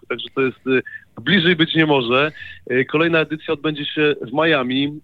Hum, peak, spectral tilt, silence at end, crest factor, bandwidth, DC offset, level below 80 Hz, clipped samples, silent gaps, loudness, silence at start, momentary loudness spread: none; -2 dBFS; -7.5 dB/octave; 0.05 s; 16 dB; 5.2 kHz; under 0.1%; -60 dBFS; under 0.1%; none; -18 LUFS; 0.1 s; 8 LU